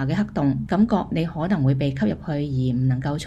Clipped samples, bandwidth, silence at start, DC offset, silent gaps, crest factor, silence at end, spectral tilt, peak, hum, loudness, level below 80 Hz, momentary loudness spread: under 0.1%; 9 kHz; 0 s; under 0.1%; none; 14 dB; 0 s; -8 dB/octave; -8 dBFS; none; -22 LUFS; -44 dBFS; 5 LU